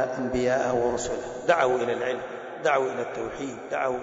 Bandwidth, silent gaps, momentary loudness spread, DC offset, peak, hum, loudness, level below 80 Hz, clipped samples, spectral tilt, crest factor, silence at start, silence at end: 8 kHz; none; 10 LU; under 0.1%; -8 dBFS; none; -27 LUFS; -54 dBFS; under 0.1%; -4.5 dB/octave; 18 dB; 0 s; 0 s